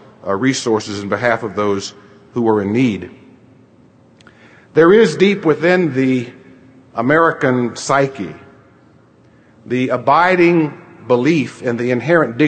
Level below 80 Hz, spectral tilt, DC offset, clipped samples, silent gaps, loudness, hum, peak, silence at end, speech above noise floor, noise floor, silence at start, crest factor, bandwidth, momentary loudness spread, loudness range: -58 dBFS; -6 dB/octave; under 0.1%; under 0.1%; none; -15 LUFS; none; 0 dBFS; 0 s; 34 dB; -48 dBFS; 0.25 s; 16 dB; 9.2 kHz; 12 LU; 5 LU